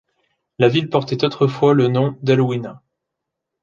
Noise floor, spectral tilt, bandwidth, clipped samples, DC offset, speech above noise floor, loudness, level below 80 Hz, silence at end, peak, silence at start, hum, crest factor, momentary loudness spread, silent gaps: -80 dBFS; -7.5 dB/octave; 7.2 kHz; under 0.1%; under 0.1%; 64 dB; -17 LUFS; -60 dBFS; 0.85 s; -2 dBFS; 0.6 s; none; 16 dB; 6 LU; none